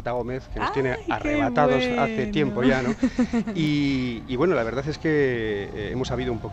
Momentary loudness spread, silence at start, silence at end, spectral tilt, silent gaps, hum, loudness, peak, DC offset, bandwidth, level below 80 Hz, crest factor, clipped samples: 8 LU; 0 s; 0 s; -6.5 dB/octave; none; none; -24 LUFS; -6 dBFS; under 0.1%; 8.4 kHz; -42 dBFS; 18 dB; under 0.1%